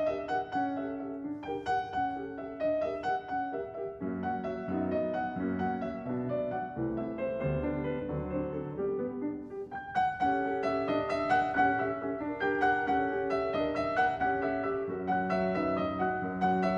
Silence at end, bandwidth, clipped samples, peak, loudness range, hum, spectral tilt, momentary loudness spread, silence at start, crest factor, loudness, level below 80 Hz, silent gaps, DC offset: 0 s; 7.6 kHz; under 0.1%; -16 dBFS; 5 LU; none; -7.5 dB/octave; 8 LU; 0 s; 16 dB; -32 LUFS; -56 dBFS; none; under 0.1%